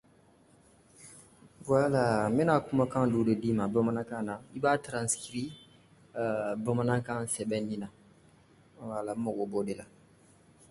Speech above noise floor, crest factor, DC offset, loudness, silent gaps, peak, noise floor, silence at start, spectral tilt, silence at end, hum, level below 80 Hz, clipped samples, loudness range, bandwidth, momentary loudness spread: 32 dB; 20 dB; under 0.1%; -31 LUFS; none; -12 dBFS; -62 dBFS; 1 s; -6 dB/octave; 0.85 s; none; -64 dBFS; under 0.1%; 7 LU; 12 kHz; 15 LU